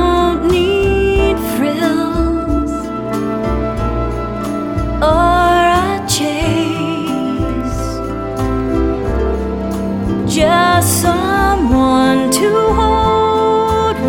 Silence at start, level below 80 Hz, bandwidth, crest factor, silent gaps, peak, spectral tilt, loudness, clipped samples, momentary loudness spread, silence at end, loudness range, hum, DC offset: 0 s; -24 dBFS; 19 kHz; 14 dB; none; 0 dBFS; -5 dB/octave; -14 LUFS; under 0.1%; 8 LU; 0 s; 5 LU; none; under 0.1%